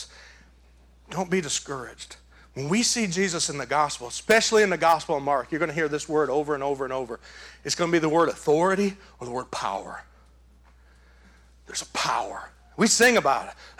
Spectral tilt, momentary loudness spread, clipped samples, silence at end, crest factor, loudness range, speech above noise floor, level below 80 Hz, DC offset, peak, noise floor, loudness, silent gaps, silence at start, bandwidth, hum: -3 dB/octave; 20 LU; under 0.1%; 0.1 s; 18 dB; 9 LU; 30 dB; -56 dBFS; under 0.1%; -8 dBFS; -55 dBFS; -24 LUFS; none; 0 s; over 20 kHz; none